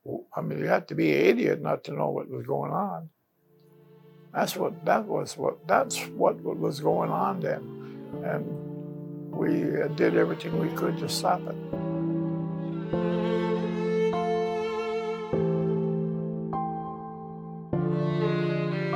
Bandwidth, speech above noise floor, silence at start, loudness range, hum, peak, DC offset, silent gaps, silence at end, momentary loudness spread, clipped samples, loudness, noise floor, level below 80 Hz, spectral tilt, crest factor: 17 kHz; 36 dB; 0.05 s; 3 LU; none; -8 dBFS; under 0.1%; none; 0 s; 11 LU; under 0.1%; -28 LUFS; -63 dBFS; -62 dBFS; -6.5 dB/octave; 20 dB